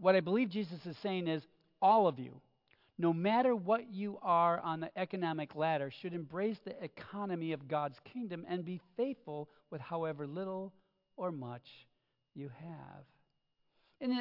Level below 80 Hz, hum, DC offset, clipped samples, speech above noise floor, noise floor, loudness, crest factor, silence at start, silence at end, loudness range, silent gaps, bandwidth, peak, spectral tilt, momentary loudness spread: -84 dBFS; none; under 0.1%; under 0.1%; 44 dB; -80 dBFS; -36 LUFS; 22 dB; 0 s; 0 s; 11 LU; none; 5.8 kHz; -14 dBFS; -5 dB/octave; 18 LU